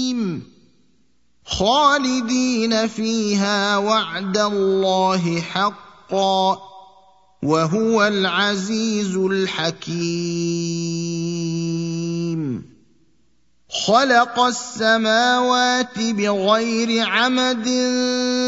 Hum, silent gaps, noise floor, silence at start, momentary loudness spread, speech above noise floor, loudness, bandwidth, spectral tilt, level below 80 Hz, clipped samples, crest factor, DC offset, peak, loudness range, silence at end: none; none; -65 dBFS; 0 s; 8 LU; 46 dB; -19 LUFS; 8 kHz; -4 dB/octave; -56 dBFS; under 0.1%; 18 dB; 0.1%; -2 dBFS; 6 LU; 0 s